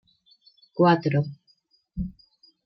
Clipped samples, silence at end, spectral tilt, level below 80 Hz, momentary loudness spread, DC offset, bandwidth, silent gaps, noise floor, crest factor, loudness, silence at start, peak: under 0.1%; 0.55 s; -9 dB/octave; -48 dBFS; 18 LU; under 0.1%; 6 kHz; none; -66 dBFS; 18 dB; -24 LUFS; 0.75 s; -8 dBFS